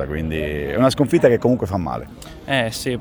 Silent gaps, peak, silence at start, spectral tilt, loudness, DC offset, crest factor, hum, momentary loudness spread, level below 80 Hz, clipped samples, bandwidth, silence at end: none; 0 dBFS; 0 s; -6 dB/octave; -19 LUFS; under 0.1%; 18 dB; none; 13 LU; -38 dBFS; under 0.1%; over 20 kHz; 0 s